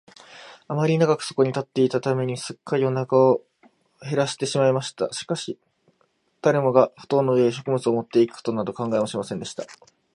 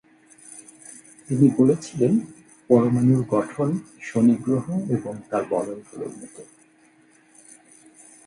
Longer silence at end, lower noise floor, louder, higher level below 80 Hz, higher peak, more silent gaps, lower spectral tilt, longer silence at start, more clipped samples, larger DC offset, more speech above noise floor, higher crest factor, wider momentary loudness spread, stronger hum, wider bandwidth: second, 0.4 s vs 1.85 s; first, -67 dBFS vs -57 dBFS; about the same, -23 LUFS vs -22 LUFS; second, -68 dBFS vs -62 dBFS; about the same, -2 dBFS vs -4 dBFS; neither; second, -6 dB/octave vs -8 dB/octave; second, 0.3 s vs 0.5 s; neither; neither; first, 45 dB vs 35 dB; about the same, 22 dB vs 20 dB; second, 13 LU vs 23 LU; neither; about the same, 11.5 kHz vs 11.5 kHz